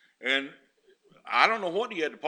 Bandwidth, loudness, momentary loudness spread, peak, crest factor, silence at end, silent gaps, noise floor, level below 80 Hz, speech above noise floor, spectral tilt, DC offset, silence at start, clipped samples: 11.5 kHz; -26 LUFS; 8 LU; -2 dBFS; 26 dB; 0 s; none; -63 dBFS; -86 dBFS; 35 dB; -3 dB/octave; under 0.1%; 0.2 s; under 0.1%